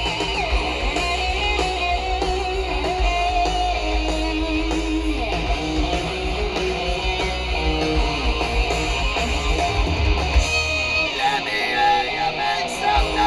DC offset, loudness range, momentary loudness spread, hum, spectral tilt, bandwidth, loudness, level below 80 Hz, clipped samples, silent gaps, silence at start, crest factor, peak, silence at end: under 0.1%; 3 LU; 4 LU; none; -4 dB/octave; 12 kHz; -21 LUFS; -26 dBFS; under 0.1%; none; 0 s; 16 dB; -6 dBFS; 0 s